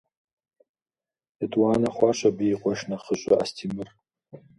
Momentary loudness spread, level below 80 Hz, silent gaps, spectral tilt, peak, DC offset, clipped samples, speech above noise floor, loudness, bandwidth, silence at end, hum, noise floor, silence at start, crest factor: 12 LU; -62 dBFS; none; -5.5 dB/octave; -6 dBFS; under 0.1%; under 0.1%; over 66 dB; -25 LUFS; 11.5 kHz; 0.2 s; none; under -90 dBFS; 1.4 s; 22 dB